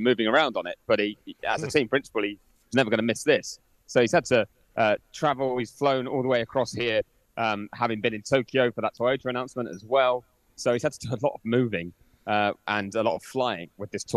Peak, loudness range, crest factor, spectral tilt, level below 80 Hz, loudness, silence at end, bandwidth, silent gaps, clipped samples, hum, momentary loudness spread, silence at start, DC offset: -6 dBFS; 2 LU; 20 dB; -5 dB/octave; -62 dBFS; -26 LUFS; 0 s; 13.5 kHz; none; under 0.1%; none; 10 LU; 0 s; under 0.1%